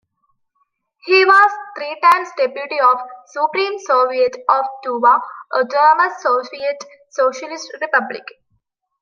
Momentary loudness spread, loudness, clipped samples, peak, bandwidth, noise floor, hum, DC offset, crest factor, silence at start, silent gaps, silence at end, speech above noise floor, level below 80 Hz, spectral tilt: 16 LU; -16 LUFS; under 0.1%; 0 dBFS; 15.5 kHz; -67 dBFS; none; under 0.1%; 16 dB; 1.05 s; none; 0.8 s; 51 dB; -74 dBFS; -2 dB/octave